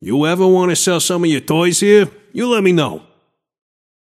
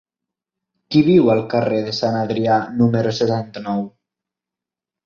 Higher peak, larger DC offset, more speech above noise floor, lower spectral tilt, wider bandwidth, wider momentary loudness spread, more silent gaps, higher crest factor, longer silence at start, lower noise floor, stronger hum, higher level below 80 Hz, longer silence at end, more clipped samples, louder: about the same, 0 dBFS vs -2 dBFS; neither; second, 47 dB vs 70 dB; second, -4.5 dB/octave vs -7 dB/octave; first, 15.5 kHz vs 7.2 kHz; about the same, 10 LU vs 11 LU; neither; about the same, 14 dB vs 16 dB; second, 0 s vs 0.9 s; second, -60 dBFS vs -87 dBFS; neither; about the same, -60 dBFS vs -56 dBFS; about the same, 1.05 s vs 1.15 s; neither; first, -14 LUFS vs -18 LUFS